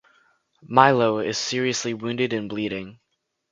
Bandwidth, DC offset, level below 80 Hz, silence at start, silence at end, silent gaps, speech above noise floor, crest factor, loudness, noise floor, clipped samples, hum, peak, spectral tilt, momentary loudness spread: 9.6 kHz; under 0.1%; -62 dBFS; 0.65 s; 0.6 s; none; 54 dB; 24 dB; -22 LUFS; -76 dBFS; under 0.1%; none; 0 dBFS; -4 dB/octave; 12 LU